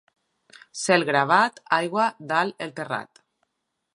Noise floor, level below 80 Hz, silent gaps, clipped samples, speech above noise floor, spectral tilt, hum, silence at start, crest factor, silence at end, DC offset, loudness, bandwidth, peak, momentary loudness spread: -79 dBFS; -78 dBFS; none; under 0.1%; 56 dB; -4 dB/octave; none; 0.75 s; 22 dB; 0.9 s; under 0.1%; -23 LUFS; 11.5 kHz; -4 dBFS; 12 LU